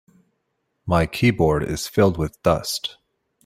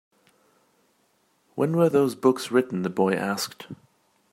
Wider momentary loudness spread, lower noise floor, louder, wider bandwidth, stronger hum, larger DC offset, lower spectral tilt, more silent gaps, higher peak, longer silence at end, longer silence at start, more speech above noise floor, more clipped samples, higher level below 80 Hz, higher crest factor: second, 9 LU vs 20 LU; first, -74 dBFS vs -67 dBFS; first, -21 LUFS vs -24 LUFS; about the same, 16 kHz vs 16 kHz; neither; neither; about the same, -5.5 dB/octave vs -6 dB/octave; neither; about the same, -4 dBFS vs -6 dBFS; about the same, 0.55 s vs 0.6 s; second, 0.85 s vs 1.55 s; first, 54 dB vs 44 dB; neither; first, -42 dBFS vs -72 dBFS; about the same, 20 dB vs 20 dB